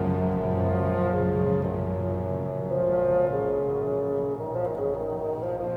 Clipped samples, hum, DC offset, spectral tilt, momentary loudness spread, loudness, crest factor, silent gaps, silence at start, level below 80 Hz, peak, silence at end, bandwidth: under 0.1%; none; under 0.1%; -10.5 dB/octave; 6 LU; -26 LUFS; 14 dB; none; 0 s; -48 dBFS; -12 dBFS; 0 s; 4.8 kHz